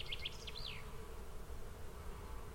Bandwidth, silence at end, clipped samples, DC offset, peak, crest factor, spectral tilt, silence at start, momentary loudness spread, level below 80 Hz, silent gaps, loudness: 16.5 kHz; 0 s; under 0.1%; under 0.1%; -30 dBFS; 16 dB; -3.5 dB/octave; 0 s; 8 LU; -50 dBFS; none; -49 LUFS